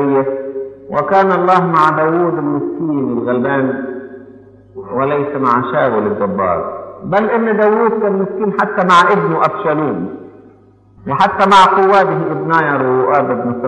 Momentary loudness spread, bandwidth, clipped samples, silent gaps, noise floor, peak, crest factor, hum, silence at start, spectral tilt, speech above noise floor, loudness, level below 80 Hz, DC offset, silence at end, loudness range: 14 LU; 9.8 kHz; under 0.1%; none; -45 dBFS; 0 dBFS; 14 dB; none; 0 s; -6.5 dB/octave; 33 dB; -13 LUFS; -54 dBFS; under 0.1%; 0 s; 5 LU